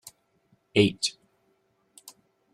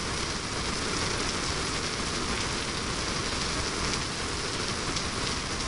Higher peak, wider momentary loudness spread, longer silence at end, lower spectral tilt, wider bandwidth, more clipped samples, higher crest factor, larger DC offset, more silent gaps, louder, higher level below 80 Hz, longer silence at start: first, -8 dBFS vs -12 dBFS; first, 27 LU vs 2 LU; first, 1.45 s vs 0 s; first, -4.5 dB/octave vs -2.5 dB/octave; first, 14 kHz vs 11.5 kHz; neither; about the same, 22 dB vs 18 dB; neither; neither; first, -25 LUFS vs -29 LUFS; second, -64 dBFS vs -42 dBFS; first, 0.75 s vs 0 s